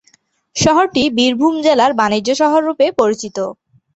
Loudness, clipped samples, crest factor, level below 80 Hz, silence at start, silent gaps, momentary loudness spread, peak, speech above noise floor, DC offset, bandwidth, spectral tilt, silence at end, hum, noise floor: -14 LUFS; under 0.1%; 14 dB; -50 dBFS; 0.55 s; none; 10 LU; 0 dBFS; 42 dB; under 0.1%; 8.2 kHz; -4 dB/octave; 0.45 s; none; -56 dBFS